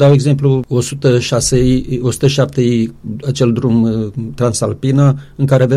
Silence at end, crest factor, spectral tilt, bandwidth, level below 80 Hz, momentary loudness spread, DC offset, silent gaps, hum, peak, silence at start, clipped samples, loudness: 0 s; 12 dB; -6.5 dB/octave; 12.5 kHz; -34 dBFS; 6 LU; under 0.1%; none; none; 0 dBFS; 0 s; under 0.1%; -14 LUFS